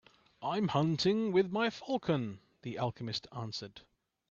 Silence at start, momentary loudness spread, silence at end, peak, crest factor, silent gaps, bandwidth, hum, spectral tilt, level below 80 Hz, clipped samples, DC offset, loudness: 0.4 s; 13 LU; 0.5 s; -16 dBFS; 18 dB; none; 7.6 kHz; none; -6 dB/octave; -70 dBFS; under 0.1%; under 0.1%; -34 LUFS